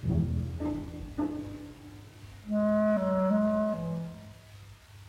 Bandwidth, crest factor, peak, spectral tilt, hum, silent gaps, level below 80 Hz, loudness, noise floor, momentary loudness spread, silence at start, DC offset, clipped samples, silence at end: 11.5 kHz; 14 dB; -16 dBFS; -9 dB/octave; none; none; -48 dBFS; -30 LUFS; -51 dBFS; 23 LU; 0 s; under 0.1%; under 0.1%; 0 s